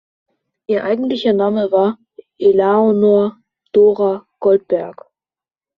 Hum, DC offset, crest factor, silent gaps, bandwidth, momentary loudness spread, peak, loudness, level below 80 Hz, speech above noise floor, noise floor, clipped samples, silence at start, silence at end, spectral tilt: none; under 0.1%; 14 dB; none; 5.4 kHz; 9 LU; -2 dBFS; -15 LUFS; -62 dBFS; over 76 dB; under -90 dBFS; under 0.1%; 0.7 s; 0.85 s; -5.5 dB/octave